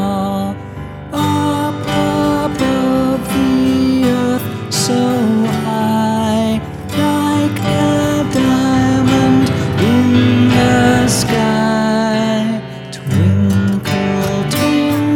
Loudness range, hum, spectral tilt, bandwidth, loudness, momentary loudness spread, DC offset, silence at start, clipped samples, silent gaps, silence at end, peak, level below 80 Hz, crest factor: 3 LU; none; -5.5 dB/octave; 17.5 kHz; -14 LUFS; 8 LU; under 0.1%; 0 s; under 0.1%; none; 0 s; 0 dBFS; -38 dBFS; 14 dB